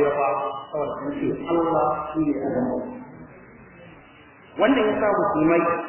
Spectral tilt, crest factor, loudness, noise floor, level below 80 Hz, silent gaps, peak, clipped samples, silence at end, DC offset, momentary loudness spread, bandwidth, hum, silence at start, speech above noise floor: -10.5 dB/octave; 18 dB; -23 LUFS; -49 dBFS; -54 dBFS; none; -6 dBFS; under 0.1%; 0 s; under 0.1%; 14 LU; 3.2 kHz; none; 0 s; 27 dB